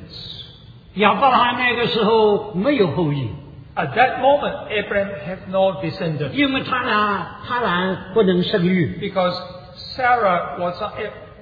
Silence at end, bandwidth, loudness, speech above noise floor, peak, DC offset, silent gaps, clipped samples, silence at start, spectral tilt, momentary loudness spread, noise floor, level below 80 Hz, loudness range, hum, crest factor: 0 s; 5 kHz; -19 LUFS; 24 dB; -2 dBFS; under 0.1%; none; under 0.1%; 0 s; -8 dB/octave; 15 LU; -42 dBFS; -48 dBFS; 3 LU; none; 18 dB